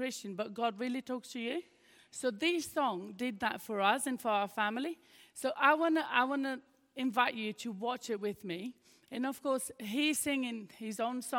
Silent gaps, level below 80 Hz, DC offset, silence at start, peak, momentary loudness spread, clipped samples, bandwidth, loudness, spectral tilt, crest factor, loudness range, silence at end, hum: none; -80 dBFS; under 0.1%; 0 s; -12 dBFS; 12 LU; under 0.1%; 17.5 kHz; -34 LUFS; -3 dB/octave; 22 dB; 4 LU; 0 s; none